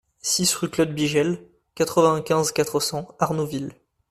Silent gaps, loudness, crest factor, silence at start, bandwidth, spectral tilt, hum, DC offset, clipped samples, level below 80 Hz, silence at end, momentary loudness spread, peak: none; -22 LUFS; 20 dB; 0.25 s; 14.5 kHz; -4 dB/octave; none; under 0.1%; under 0.1%; -58 dBFS; 0.4 s; 8 LU; -4 dBFS